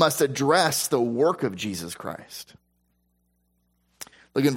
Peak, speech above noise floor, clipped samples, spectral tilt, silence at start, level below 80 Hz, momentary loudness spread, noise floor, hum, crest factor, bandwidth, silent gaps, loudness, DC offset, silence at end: -6 dBFS; 46 dB; under 0.1%; -4 dB/octave; 0 s; -66 dBFS; 20 LU; -70 dBFS; 60 Hz at -65 dBFS; 20 dB; 16.5 kHz; none; -24 LUFS; under 0.1%; 0 s